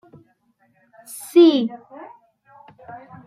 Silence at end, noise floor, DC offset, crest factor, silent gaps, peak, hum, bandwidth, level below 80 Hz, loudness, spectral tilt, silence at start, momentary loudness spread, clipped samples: 0.3 s; -63 dBFS; under 0.1%; 18 dB; none; -4 dBFS; none; 14.5 kHz; -74 dBFS; -16 LUFS; -5 dB/octave; 1.1 s; 28 LU; under 0.1%